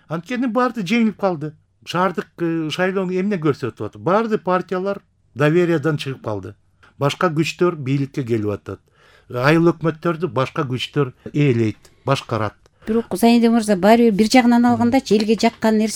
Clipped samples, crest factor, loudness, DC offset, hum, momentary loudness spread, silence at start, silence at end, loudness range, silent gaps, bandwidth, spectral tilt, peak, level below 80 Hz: under 0.1%; 18 dB; -19 LUFS; under 0.1%; none; 12 LU; 0.1 s; 0 s; 6 LU; none; 16 kHz; -6 dB/octave; 0 dBFS; -56 dBFS